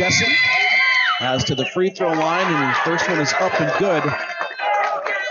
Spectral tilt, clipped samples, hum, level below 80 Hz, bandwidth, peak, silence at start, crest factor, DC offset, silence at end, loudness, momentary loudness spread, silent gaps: -3.5 dB/octave; under 0.1%; none; -56 dBFS; 7.4 kHz; -4 dBFS; 0 s; 14 dB; under 0.1%; 0 s; -18 LUFS; 7 LU; none